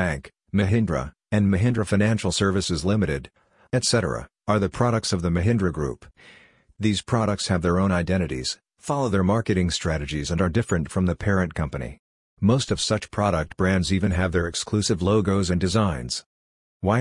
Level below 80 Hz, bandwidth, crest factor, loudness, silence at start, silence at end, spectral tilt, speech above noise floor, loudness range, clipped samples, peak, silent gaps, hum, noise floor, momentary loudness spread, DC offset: -44 dBFS; 11 kHz; 18 dB; -23 LUFS; 0 s; 0 s; -5.5 dB/octave; over 67 dB; 2 LU; under 0.1%; -6 dBFS; 11.99-12.37 s, 16.26-16.80 s; none; under -90 dBFS; 8 LU; under 0.1%